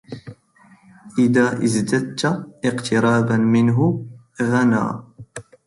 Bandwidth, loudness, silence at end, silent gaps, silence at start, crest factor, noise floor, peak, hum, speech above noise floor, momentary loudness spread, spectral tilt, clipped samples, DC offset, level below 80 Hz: 11.5 kHz; -19 LUFS; 0.25 s; none; 0.1 s; 16 dB; -52 dBFS; -4 dBFS; none; 34 dB; 21 LU; -6.5 dB/octave; under 0.1%; under 0.1%; -56 dBFS